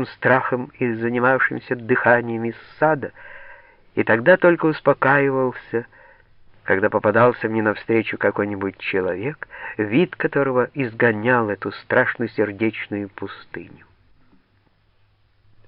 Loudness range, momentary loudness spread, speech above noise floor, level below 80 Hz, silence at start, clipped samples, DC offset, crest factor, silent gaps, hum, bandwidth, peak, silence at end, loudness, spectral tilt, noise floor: 5 LU; 13 LU; 40 dB; -58 dBFS; 0 s; under 0.1%; under 0.1%; 18 dB; none; none; 5.4 kHz; -2 dBFS; 2 s; -20 LUFS; -5 dB/octave; -60 dBFS